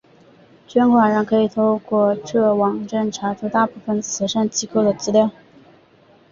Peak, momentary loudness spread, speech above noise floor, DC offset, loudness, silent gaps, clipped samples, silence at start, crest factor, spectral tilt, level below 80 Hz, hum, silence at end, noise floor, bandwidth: -2 dBFS; 7 LU; 34 dB; under 0.1%; -19 LUFS; none; under 0.1%; 0.7 s; 16 dB; -5 dB/octave; -60 dBFS; none; 1 s; -52 dBFS; 7.4 kHz